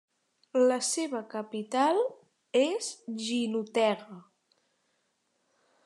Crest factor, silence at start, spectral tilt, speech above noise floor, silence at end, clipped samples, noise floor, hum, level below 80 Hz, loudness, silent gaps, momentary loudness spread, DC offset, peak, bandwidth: 18 dB; 0.55 s; -3 dB/octave; 47 dB; 1.65 s; under 0.1%; -76 dBFS; none; under -90 dBFS; -29 LUFS; none; 11 LU; under 0.1%; -12 dBFS; 12.5 kHz